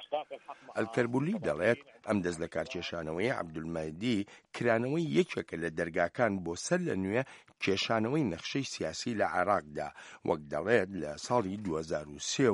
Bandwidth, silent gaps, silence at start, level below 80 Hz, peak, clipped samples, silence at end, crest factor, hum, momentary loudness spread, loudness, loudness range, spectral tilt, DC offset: 11.5 kHz; none; 0 s; -64 dBFS; -12 dBFS; under 0.1%; 0 s; 20 dB; none; 8 LU; -33 LUFS; 2 LU; -5 dB/octave; under 0.1%